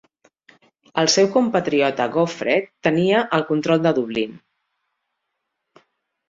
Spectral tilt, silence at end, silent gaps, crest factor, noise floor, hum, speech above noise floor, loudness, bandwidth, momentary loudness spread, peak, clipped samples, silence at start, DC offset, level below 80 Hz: -4.5 dB/octave; 1.95 s; none; 18 dB; -78 dBFS; none; 59 dB; -19 LUFS; 7.8 kHz; 7 LU; -2 dBFS; under 0.1%; 0.95 s; under 0.1%; -64 dBFS